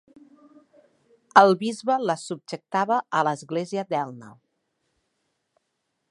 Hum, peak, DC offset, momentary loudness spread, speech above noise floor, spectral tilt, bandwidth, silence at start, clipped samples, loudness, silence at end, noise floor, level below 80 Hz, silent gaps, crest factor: none; 0 dBFS; under 0.1%; 17 LU; 54 dB; -5 dB/octave; 11.5 kHz; 1.35 s; under 0.1%; -23 LUFS; 1.8 s; -77 dBFS; -78 dBFS; none; 26 dB